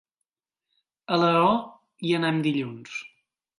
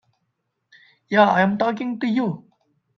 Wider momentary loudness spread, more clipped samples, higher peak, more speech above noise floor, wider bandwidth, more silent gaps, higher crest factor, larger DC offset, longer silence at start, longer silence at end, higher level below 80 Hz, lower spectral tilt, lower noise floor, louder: first, 16 LU vs 10 LU; neither; second, -8 dBFS vs -2 dBFS; first, 63 dB vs 55 dB; first, 11.5 kHz vs 6.6 kHz; neither; about the same, 18 dB vs 20 dB; neither; about the same, 1.1 s vs 1.1 s; about the same, 0.5 s vs 0.55 s; about the same, -68 dBFS vs -66 dBFS; about the same, -6.5 dB/octave vs -7 dB/octave; first, -87 dBFS vs -75 dBFS; second, -24 LUFS vs -20 LUFS